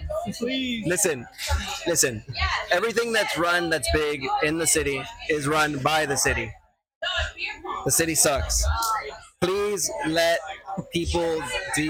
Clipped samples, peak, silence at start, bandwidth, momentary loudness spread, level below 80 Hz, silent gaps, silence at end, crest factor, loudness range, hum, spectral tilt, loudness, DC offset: under 0.1%; -6 dBFS; 0 s; 17.5 kHz; 9 LU; -38 dBFS; 6.95-7.01 s; 0 s; 20 dB; 2 LU; none; -3 dB/octave; -24 LUFS; under 0.1%